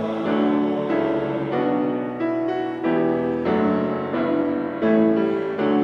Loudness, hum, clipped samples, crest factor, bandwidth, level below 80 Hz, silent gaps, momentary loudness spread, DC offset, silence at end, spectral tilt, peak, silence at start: -22 LUFS; none; under 0.1%; 14 dB; 6 kHz; -60 dBFS; none; 5 LU; under 0.1%; 0 s; -9 dB/octave; -8 dBFS; 0 s